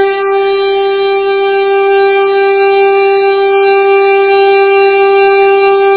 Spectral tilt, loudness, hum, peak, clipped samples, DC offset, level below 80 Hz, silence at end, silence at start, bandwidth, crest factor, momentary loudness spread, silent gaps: -7 dB/octave; -8 LUFS; none; 0 dBFS; 0.4%; 0.4%; -56 dBFS; 0 s; 0 s; 4 kHz; 8 dB; 4 LU; none